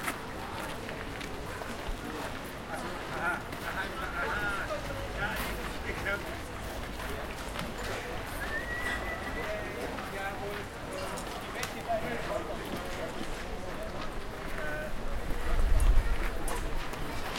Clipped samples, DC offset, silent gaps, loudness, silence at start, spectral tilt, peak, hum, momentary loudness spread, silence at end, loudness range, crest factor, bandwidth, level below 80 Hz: under 0.1%; under 0.1%; none; -36 LUFS; 0 s; -4.5 dB/octave; -12 dBFS; none; 6 LU; 0 s; 3 LU; 20 dB; 16.5 kHz; -36 dBFS